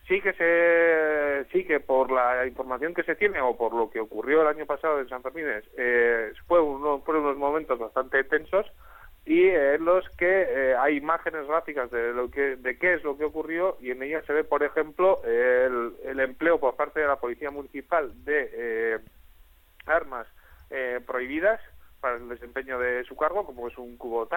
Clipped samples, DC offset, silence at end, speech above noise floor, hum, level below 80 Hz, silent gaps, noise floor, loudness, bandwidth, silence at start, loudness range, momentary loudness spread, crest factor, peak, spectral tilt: under 0.1%; under 0.1%; 0 s; 29 dB; none; -54 dBFS; none; -55 dBFS; -26 LUFS; 17.5 kHz; 0.05 s; 6 LU; 11 LU; 16 dB; -8 dBFS; -6.5 dB/octave